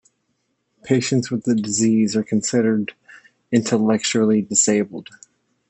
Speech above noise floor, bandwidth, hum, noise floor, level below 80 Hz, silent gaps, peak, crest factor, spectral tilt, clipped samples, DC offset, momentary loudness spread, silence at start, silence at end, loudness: 52 dB; 8.6 kHz; none; -71 dBFS; -66 dBFS; none; -4 dBFS; 18 dB; -4.5 dB/octave; under 0.1%; under 0.1%; 6 LU; 0.85 s; 0.65 s; -19 LUFS